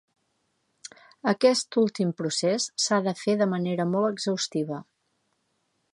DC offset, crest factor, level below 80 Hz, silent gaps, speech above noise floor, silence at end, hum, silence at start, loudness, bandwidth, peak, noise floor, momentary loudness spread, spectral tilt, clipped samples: under 0.1%; 20 dB; -76 dBFS; none; 49 dB; 1.1 s; none; 0.85 s; -25 LUFS; 11.5 kHz; -8 dBFS; -74 dBFS; 15 LU; -4.5 dB/octave; under 0.1%